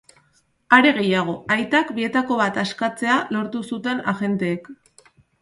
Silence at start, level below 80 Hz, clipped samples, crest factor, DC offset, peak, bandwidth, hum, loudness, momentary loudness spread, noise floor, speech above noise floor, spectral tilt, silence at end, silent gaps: 0.7 s; -64 dBFS; under 0.1%; 20 dB; under 0.1%; 0 dBFS; 11.5 kHz; none; -20 LUFS; 11 LU; -63 dBFS; 42 dB; -5.5 dB/octave; 0.7 s; none